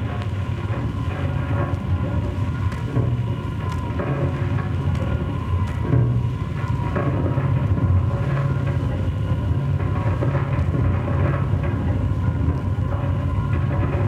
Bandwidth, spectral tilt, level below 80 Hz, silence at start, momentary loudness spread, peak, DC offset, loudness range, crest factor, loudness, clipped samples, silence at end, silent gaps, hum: 8 kHz; -9 dB/octave; -32 dBFS; 0 s; 5 LU; -8 dBFS; under 0.1%; 2 LU; 14 dB; -23 LUFS; under 0.1%; 0 s; none; none